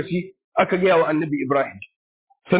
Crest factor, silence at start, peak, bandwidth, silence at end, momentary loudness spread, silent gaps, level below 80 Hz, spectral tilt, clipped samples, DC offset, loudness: 16 dB; 0 s; -6 dBFS; 4 kHz; 0 s; 11 LU; 0.44-0.52 s, 1.96-2.27 s; -60 dBFS; -10.5 dB/octave; under 0.1%; under 0.1%; -21 LUFS